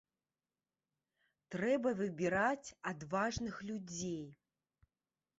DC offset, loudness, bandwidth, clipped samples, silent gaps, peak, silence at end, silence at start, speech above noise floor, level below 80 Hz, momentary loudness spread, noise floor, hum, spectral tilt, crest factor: under 0.1%; -38 LUFS; 8 kHz; under 0.1%; none; -20 dBFS; 1.05 s; 1.5 s; over 52 dB; -68 dBFS; 11 LU; under -90 dBFS; none; -4.5 dB/octave; 20 dB